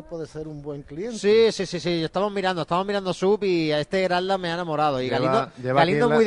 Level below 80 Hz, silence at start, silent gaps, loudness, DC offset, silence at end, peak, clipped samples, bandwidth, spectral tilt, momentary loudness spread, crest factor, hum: -54 dBFS; 0 s; none; -23 LUFS; under 0.1%; 0 s; -4 dBFS; under 0.1%; 11 kHz; -5.5 dB/octave; 15 LU; 18 dB; none